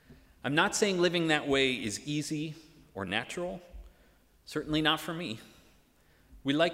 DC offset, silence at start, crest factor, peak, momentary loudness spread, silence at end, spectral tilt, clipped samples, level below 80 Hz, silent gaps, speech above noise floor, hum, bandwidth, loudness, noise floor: under 0.1%; 0.1 s; 22 dB; -10 dBFS; 14 LU; 0 s; -4 dB/octave; under 0.1%; -58 dBFS; none; 34 dB; none; 16 kHz; -31 LUFS; -64 dBFS